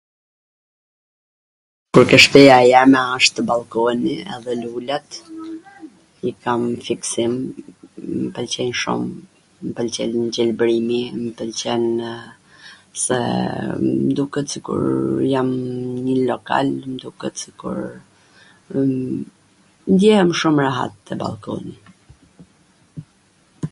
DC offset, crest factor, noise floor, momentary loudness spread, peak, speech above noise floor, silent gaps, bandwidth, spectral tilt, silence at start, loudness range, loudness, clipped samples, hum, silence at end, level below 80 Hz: under 0.1%; 20 dB; -57 dBFS; 19 LU; 0 dBFS; 39 dB; none; 15 kHz; -4.5 dB/octave; 1.95 s; 12 LU; -18 LUFS; under 0.1%; none; 0.05 s; -56 dBFS